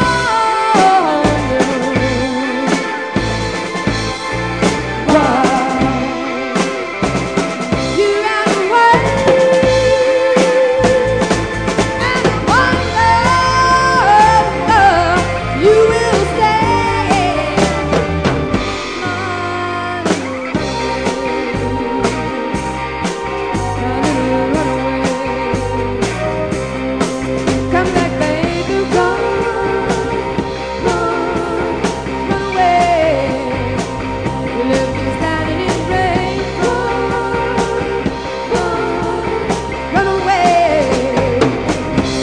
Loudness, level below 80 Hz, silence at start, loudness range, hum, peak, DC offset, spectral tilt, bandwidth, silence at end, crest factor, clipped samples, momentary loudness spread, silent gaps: -14 LUFS; -32 dBFS; 0 s; 6 LU; none; 0 dBFS; 0.4%; -5 dB/octave; 10 kHz; 0 s; 14 dB; under 0.1%; 8 LU; none